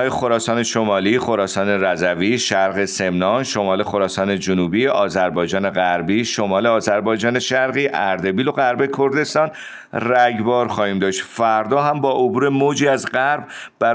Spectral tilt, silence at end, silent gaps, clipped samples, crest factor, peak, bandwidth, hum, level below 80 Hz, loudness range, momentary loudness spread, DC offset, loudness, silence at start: -4.5 dB/octave; 0 s; none; under 0.1%; 14 dB; -4 dBFS; 10 kHz; none; -58 dBFS; 1 LU; 3 LU; under 0.1%; -18 LUFS; 0 s